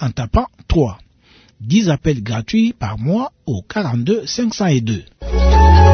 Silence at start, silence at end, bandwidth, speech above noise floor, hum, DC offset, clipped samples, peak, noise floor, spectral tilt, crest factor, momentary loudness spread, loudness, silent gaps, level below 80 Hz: 0 s; 0 s; 6.6 kHz; 33 dB; none; under 0.1%; under 0.1%; 0 dBFS; -50 dBFS; -6.5 dB/octave; 14 dB; 10 LU; -17 LUFS; none; -20 dBFS